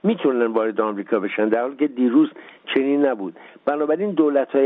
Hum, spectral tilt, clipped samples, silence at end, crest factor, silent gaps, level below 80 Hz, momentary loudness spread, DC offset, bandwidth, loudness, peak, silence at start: none; -5 dB/octave; under 0.1%; 0 s; 14 dB; none; -72 dBFS; 7 LU; under 0.1%; 3.9 kHz; -21 LUFS; -6 dBFS; 0.05 s